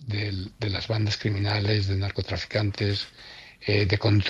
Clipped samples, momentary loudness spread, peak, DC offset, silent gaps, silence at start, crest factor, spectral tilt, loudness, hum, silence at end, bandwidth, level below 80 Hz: under 0.1%; 9 LU; -8 dBFS; under 0.1%; none; 0 s; 18 dB; -6.5 dB/octave; -27 LUFS; none; 0 s; 7.4 kHz; -52 dBFS